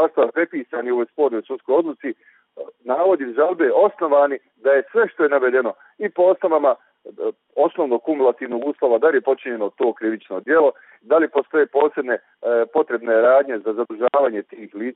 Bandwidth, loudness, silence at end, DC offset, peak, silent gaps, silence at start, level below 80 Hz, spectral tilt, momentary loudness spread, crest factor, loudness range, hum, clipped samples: 4 kHz; -19 LUFS; 0.05 s; under 0.1%; -4 dBFS; none; 0 s; -70 dBFS; -3 dB/octave; 11 LU; 16 dB; 2 LU; none; under 0.1%